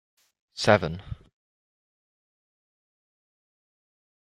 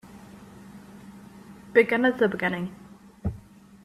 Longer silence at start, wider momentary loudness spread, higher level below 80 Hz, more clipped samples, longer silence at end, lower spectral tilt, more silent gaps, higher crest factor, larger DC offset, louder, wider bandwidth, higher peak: first, 0.55 s vs 0.05 s; second, 22 LU vs 25 LU; about the same, -56 dBFS vs -52 dBFS; neither; first, 3.2 s vs 0.45 s; second, -5 dB/octave vs -7 dB/octave; neither; about the same, 28 dB vs 24 dB; neither; about the same, -24 LUFS vs -25 LUFS; about the same, 13 kHz vs 13.5 kHz; about the same, -4 dBFS vs -6 dBFS